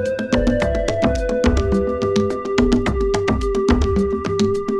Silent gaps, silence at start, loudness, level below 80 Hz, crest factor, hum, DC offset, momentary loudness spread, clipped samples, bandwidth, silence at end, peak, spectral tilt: none; 0 s; -19 LUFS; -26 dBFS; 14 dB; none; under 0.1%; 3 LU; under 0.1%; 11.5 kHz; 0 s; -4 dBFS; -6.5 dB/octave